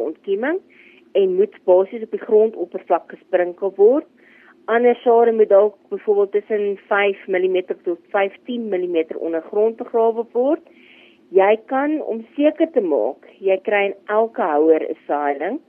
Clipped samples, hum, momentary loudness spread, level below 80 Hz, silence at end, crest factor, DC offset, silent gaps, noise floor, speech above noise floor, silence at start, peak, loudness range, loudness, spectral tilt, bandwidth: under 0.1%; none; 9 LU; -80 dBFS; 0.1 s; 16 dB; under 0.1%; none; -50 dBFS; 31 dB; 0 s; -4 dBFS; 4 LU; -19 LUFS; -8.5 dB/octave; 3.5 kHz